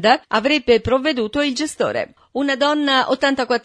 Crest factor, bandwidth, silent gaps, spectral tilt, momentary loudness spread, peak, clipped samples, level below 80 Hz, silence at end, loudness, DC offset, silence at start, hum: 18 dB; 11 kHz; none; -3.5 dB/octave; 6 LU; 0 dBFS; under 0.1%; -48 dBFS; 0.05 s; -18 LUFS; under 0.1%; 0 s; none